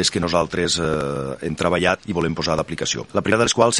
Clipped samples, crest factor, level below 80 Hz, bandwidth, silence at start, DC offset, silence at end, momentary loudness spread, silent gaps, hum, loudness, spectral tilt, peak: under 0.1%; 20 dB; -44 dBFS; 11.5 kHz; 0 s; under 0.1%; 0 s; 6 LU; none; none; -21 LUFS; -3.5 dB/octave; 0 dBFS